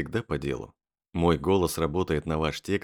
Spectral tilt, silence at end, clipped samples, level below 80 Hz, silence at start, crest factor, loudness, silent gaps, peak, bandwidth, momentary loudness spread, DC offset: -6 dB/octave; 0 s; under 0.1%; -46 dBFS; 0 s; 18 dB; -28 LUFS; none; -10 dBFS; 19.5 kHz; 12 LU; under 0.1%